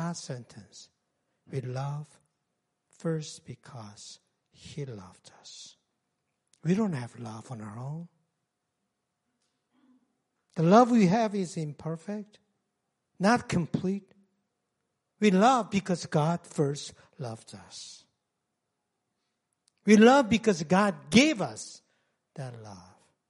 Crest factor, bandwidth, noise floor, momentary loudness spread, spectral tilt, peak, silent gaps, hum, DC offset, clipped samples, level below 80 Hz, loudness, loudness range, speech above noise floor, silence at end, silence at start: 24 dB; 11.5 kHz; -83 dBFS; 24 LU; -5.5 dB/octave; -6 dBFS; none; none; under 0.1%; under 0.1%; -68 dBFS; -26 LUFS; 16 LU; 55 dB; 0.5 s; 0 s